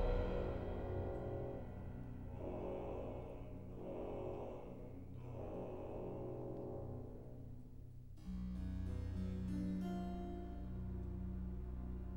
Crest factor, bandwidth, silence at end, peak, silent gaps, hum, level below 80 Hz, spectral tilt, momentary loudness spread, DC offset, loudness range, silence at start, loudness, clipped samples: 18 dB; 16 kHz; 0 s; -28 dBFS; none; none; -50 dBFS; -9 dB/octave; 10 LU; 0.1%; 4 LU; 0 s; -47 LUFS; under 0.1%